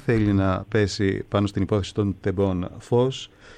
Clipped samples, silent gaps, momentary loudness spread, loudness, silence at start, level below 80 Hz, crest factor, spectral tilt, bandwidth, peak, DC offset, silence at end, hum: under 0.1%; none; 5 LU; -24 LUFS; 0.05 s; -46 dBFS; 12 dB; -7 dB/octave; 9.8 kHz; -10 dBFS; under 0.1%; 0 s; none